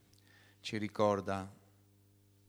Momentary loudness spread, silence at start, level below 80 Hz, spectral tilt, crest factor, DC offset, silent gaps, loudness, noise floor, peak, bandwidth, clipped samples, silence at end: 14 LU; 0.65 s; -78 dBFS; -6 dB/octave; 22 dB; under 0.1%; none; -36 LUFS; -67 dBFS; -18 dBFS; over 20 kHz; under 0.1%; 0.95 s